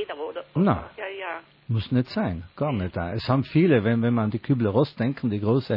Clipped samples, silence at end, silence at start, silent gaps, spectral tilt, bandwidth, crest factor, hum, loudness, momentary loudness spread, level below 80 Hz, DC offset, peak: under 0.1%; 0 s; 0 s; none; -10 dB/octave; 5.6 kHz; 18 dB; none; -25 LUFS; 12 LU; -54 dBFS; under 0.1%; -8 dBFS